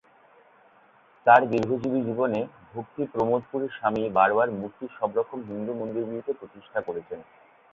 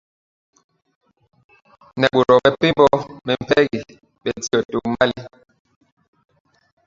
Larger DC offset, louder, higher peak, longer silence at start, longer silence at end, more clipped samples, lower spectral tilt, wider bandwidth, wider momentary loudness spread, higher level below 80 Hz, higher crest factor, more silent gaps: neither; second, -26 LUFS vs -18 LUFS; second, -4 dBFS vs 0 dBFS; second, 1.25 s vs 1.95 s; second, 0.5 s vs 1.6 s; neither; first, -8 dB/octave vs -5 dB/octave; about the same, 7.4 kHz vs 7.8 kHz; about the same, 17 LU vs 15 LU; second, -64 dBFS vs -54 dBFS; about the same, 24 dB vs 20 dB; second, none vs 4.65-4.69 s